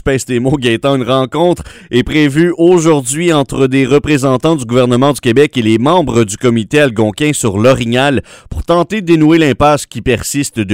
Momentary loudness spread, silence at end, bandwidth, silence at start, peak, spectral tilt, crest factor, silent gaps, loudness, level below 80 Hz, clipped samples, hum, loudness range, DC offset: 6 LU; 0 s; 16 kHz; 0.05 s; 0 dBFS; -5.5 dB/octave; 10 dB; none; -11 LUFS; -34 dBFS; 0.4%; none; 1 LU; 0.2%